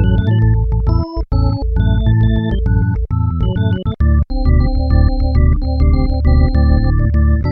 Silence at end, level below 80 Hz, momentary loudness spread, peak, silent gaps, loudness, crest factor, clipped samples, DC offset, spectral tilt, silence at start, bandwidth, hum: 0 s; -14 dBFS; 4 LU; 0 dBFS; none; -15 LUFS; 12 dB; under 0.1%; under 0.1%; -11 dB/octave; 0 s; 5.6 kHz; none